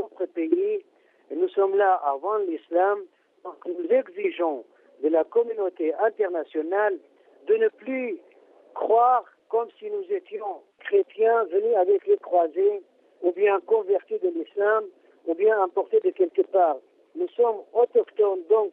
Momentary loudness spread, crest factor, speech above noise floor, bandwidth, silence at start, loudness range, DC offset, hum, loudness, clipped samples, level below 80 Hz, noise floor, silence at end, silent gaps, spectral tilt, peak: 13 LU; 14 dB; 31 dB; 3.8 kHz; 0 s; 3 LU; under 0.1%; none; -24 LUFS; under 0.1%; -84 dBFS; -54 dBFS; 0 s; none; -7.5 dB/octave; -10 dBFS